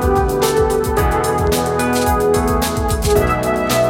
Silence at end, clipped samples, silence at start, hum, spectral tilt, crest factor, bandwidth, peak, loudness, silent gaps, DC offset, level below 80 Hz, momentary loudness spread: 0 s; under 0.1%; 0 s; none; -5 dB/octave; 14 dB; 17 kHz; -2 dBFS; -16 LUFS; none; under 0.1%; -24 dBFS; 2 LU